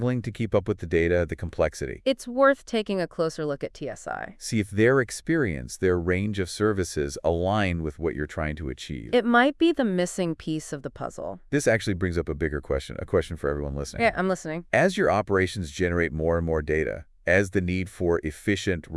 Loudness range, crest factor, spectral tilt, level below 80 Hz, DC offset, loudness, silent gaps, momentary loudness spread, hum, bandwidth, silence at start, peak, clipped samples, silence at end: 2 LU; 18 dB; -5.5 dB/octave; -44 dBFS; under 0.1%; -26 LUFS; none; 10 LU; none; 12 kHz; 0 s; -6 dBFS; under 0.1%; 0 s